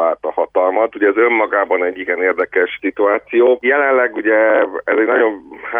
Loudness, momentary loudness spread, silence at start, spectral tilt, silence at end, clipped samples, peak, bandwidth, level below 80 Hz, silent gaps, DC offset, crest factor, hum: -15 LUFS; 5 LU; 0 s; -7 dB/octave; 0 s; under 0.1%; -2 dBFS; 3.7 kHz; -62 dBFS; none; under 0.1%; 12 dB; none